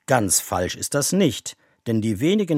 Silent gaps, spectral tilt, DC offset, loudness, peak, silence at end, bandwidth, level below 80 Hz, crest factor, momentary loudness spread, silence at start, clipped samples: none; -4 dB/octave; under 0.1%; -21 LUFS; -2 dBFS; 0 s; 16.5 kHz; -54 dBFS; 20 dB; 13 LU; 0.1 s; under 0.1%